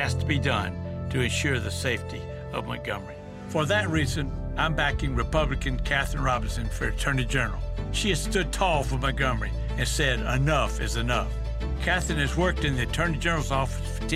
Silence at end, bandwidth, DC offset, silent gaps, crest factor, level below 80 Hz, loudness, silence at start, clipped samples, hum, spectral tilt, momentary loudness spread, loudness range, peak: 0 s; 15 kHz; under 0.1%; none; 18 dB; -32 dBFS; -27 LUFS; 0 s; under 0.1%; none; -4.5 dB/octave; 8 LU; 3 LU; -8 dBFS